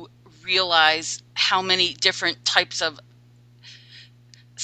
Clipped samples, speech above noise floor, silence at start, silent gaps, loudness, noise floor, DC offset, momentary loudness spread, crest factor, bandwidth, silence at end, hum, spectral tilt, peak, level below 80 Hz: under 0.1%; 31 dB; 0 s; none; -20 LUFS; -52 dBFS; under 0.1%; 10 LU; 24 dB; 14.5 kHz; 0 s; 60 Hz at -50 dBFS; -1 dB/octave; 0 dBFS; -66 dBFS